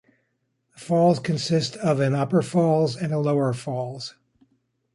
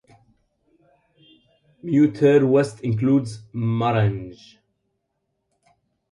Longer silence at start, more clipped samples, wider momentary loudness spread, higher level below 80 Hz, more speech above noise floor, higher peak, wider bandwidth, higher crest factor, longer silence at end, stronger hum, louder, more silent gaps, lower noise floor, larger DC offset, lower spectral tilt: second, 0.8 s vs 1.85 s; neither; second, 11 LU vs 16 LU; second, -64 dBFS vs -56 dBFS; second, 51 dB vs 56 dB; about the same, -8 dBFS vs -6 dBFS; about the same, 11.5 kHz vs 11 kHz; about the same, 16 dB vs 18 dB; second, 0.85 s vs 1.8 s; neither; second, -23 LUFS vs -20 LUFS; neither; about the same, -73 dBFS vs -75 dBFS; neither; second, -6.5 dB/octave vs -8 dB/octave